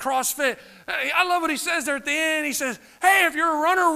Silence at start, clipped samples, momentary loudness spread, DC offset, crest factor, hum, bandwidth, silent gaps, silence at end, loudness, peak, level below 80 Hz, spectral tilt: 0 s; under 0.1%; 9 LU; under 0.1%; 18 dB; none; 15.5 kHz; none; 0 s; -22 LUFS; -6 dBFS; -62 dBFS; -0.5 dB/octave